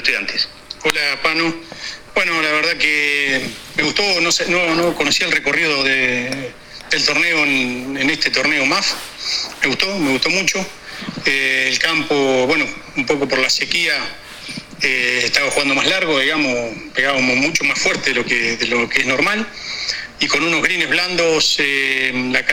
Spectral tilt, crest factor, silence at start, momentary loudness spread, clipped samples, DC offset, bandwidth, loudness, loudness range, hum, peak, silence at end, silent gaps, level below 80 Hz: -2 dB/octave; 18 dB; 0 s; 8 LU; under 0.1%; under 0.1%; 18 kHz; -16 LUFS; 2 LU; none; 0 dBFS; 0 s; none; -48 dBFS